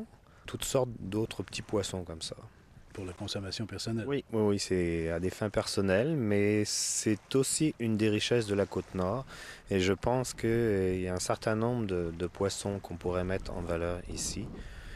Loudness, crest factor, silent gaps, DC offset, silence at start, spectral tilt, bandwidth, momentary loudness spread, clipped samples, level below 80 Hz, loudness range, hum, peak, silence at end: -32 LUFS; 18 dB; none; under 0.1%; 0 s; -4.5 dB/octave; 15 kHz; 12 LU; under 0.1%; -52 dBFS; 7 LU; none; -14 dBFS; 0 s